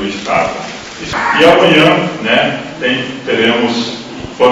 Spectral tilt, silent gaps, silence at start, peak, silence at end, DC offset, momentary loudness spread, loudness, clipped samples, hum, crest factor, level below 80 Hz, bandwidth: -4.5 dB/octave; none; 0 s; 0 dBFS; 0 s; under 0.1%; 16 LU; -11 LUFS; 0.4%; none; 12 dB; -44 dBFS; 12.5 kHz